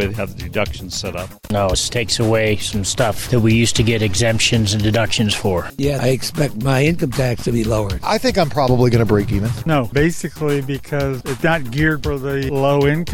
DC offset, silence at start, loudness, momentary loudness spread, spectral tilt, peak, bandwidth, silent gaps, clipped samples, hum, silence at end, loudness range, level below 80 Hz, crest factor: under 0.1%; 0 s; -18 LUFS; 8 LU; -5 dB/octave; -4 dBFS; 17 kHz; none; under 0.1%; none; 0 s; 3 LU; -34 dBFS; 14 dB